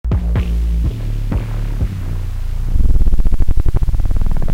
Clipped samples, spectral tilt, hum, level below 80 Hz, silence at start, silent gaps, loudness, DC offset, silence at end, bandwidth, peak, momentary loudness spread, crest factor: under 0.1%; -8 dB/octave; none; -14 dBFS; 0.05 s; none; -20 LUFS; under 0.1%; 0 s; 4.6 kHz; 0 dBFS; 6 LU; 12 dB